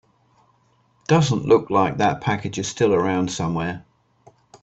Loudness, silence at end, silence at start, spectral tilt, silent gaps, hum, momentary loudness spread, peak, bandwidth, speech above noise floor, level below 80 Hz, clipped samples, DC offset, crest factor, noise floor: -21 LUFS; 0.05 s; 1.1 s; -5.5 dB/octave; none; none; 10 LU; -4 dBFS; 8.4 kHz; 42 dB; -54 dBFS; under 0.1%; under 0.1%; 18 dB; -62 dBFS